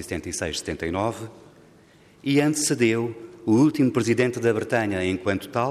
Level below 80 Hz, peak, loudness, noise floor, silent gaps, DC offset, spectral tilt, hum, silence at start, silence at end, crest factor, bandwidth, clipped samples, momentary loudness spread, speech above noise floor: -54 dBFS; -8 dBFS; -23 LUFS; -53 dBFS; none; under 0.1%; -5 dB/octave; none; 0 s; 0 s; 16 dB; 15 kHz; under 0.1%; 11 LU; 30 dB